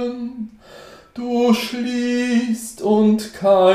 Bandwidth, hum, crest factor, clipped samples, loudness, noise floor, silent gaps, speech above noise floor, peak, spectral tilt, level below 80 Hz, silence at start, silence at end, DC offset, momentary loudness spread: 15.5 kHz; none; 16 dB; under 0.1%; -19 LUFS; -42 dBFS; none; 25 dB; -4 dBFS; -5.5 dB/octave; -58 dBFS; 0 s; 0 s; under 0.1%; 15 LU